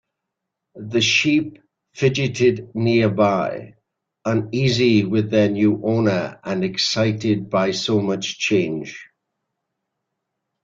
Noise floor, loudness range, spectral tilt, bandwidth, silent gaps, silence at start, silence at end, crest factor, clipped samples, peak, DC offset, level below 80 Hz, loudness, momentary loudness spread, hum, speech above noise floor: -81 dBFS; 3 LU; -5.5 dB/octave; 7.8 kHz; none; 0.75 s; 1.6 s; 16 dB; under 0.1%; -4 dBFS; under 0.1%; -56 dBFS; -19 LUFS; 10 LU; none; 62 dB